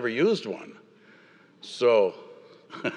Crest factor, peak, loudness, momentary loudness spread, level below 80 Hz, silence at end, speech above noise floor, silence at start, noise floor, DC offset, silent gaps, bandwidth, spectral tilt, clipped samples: 18 dB; -10 dBFS; -25 LUFS; 24 LU; -88 dBFS; 0 s; 31 dB; 0 s; -56 dBFS; under 0.1%; none; 10 kHz; -5.5 dB/octave; under 0.1%